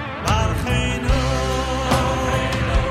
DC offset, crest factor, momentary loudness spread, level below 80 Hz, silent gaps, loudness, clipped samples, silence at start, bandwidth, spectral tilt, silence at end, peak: under 0.1%; 16 dB; 2 LU; -26 dBFS; none; -20 LUFS; under 0.1%; 0 s; 15 kHz; -5 dB/octave; 0 s; -4 dBFS